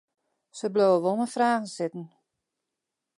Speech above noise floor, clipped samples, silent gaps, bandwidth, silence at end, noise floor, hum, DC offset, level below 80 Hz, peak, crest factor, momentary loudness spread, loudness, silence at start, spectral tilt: 60 dB; under 0.1%; none; 11.5 kHz; 1.1 s; -86 dBFS; none; under 0.1%; -82 dBFS; -10 dBFS; 18 dB; 15 LU; -26 LUFS; 0.55 s; -5.5 dB/octave